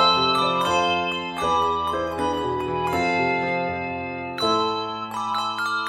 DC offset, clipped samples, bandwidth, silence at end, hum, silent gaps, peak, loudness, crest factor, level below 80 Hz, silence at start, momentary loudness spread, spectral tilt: under 0.1%; under 0.1%; 16 kHz; 0 s; none; none; -6 dBFS; -23 LUFS; 16 dB; -50 dBFS; 0 s; 8 LU; -4 dB/octave